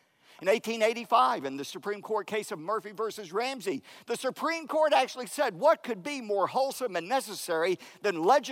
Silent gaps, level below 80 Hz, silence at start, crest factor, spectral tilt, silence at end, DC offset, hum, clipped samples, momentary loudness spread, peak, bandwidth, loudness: none; -90 dBFS; 0.4 s; 18 dB; -3 dB/octave; 0 s; under 0.1%; none; under 0.1%; 11 LU; -12 dBFS; 16 kHz; -29 LUFS